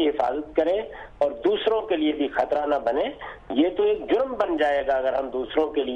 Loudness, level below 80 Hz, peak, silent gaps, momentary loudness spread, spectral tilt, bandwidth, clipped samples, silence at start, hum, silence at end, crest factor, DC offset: -24 LUFS; -52 dBFS; -10 dBFS; none; 5 LU; -6 dB/octave; 7.4 kHz; under 0.1%; 0 s; none; 0 s; 14 dB; under 0.1%